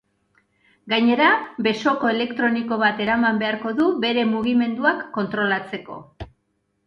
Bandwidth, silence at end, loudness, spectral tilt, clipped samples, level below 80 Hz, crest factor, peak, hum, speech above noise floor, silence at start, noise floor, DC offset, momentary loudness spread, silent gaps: 6.8 kHz; 0.6 s; -20 LUFS; -6 dB/octave; under 0.1%; -56 dBFS; 18 dB; -4 dBFS; none; 50 dB; 0.85 s; -71 dBFS; under 0.1%; 15 LU; none